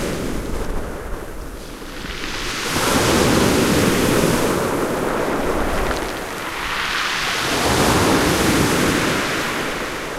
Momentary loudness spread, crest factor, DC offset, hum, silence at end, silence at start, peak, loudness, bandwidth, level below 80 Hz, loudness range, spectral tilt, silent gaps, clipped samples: 14 LU; 16 dB; under 0.1%; none; 0 s; 0 s; -2 dBFS; -19 LUFS; 16 kHz; -32 dBFS; 3 LU; -4 dB/octave; none; under 0.1%